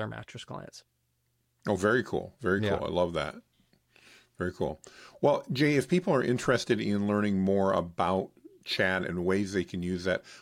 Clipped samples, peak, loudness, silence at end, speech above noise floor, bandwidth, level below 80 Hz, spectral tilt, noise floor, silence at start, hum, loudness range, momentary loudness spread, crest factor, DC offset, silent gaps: under 0.1%; -10 dBFS; -29 LUFS; 0 s; 46 dB; 15 kHz; -58 dBFS; -6 dB/octave; -75 dBFS; 0 s; none; 4 LU; 15 LU; 20 dB; under 0.1%; none